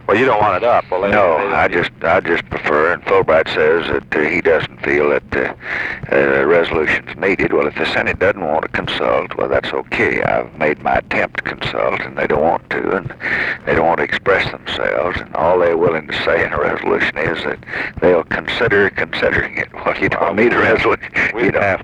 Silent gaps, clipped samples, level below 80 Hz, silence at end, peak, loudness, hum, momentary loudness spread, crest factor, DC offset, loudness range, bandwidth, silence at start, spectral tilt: none; under 0.1%; -40 dBFS; 0 s; -2 dBFS; -16 LUFS; none; 7 LU; 14 dB; under 0.1%; 3 LU; 9.8 kHz; 0 s; -6 dB/octave